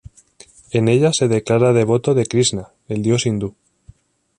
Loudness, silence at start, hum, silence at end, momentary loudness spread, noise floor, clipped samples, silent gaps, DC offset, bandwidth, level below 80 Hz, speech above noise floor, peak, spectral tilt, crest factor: -17 LUFS; 0.75 s; none; 0.9 s; 10 LU; -49 dBFS; under 0.1%; none; under 0.1%; 10.5 kHz; -50 dBFS; 33 dB; -2 dBFS; -5.5 dB/octave; 16 dB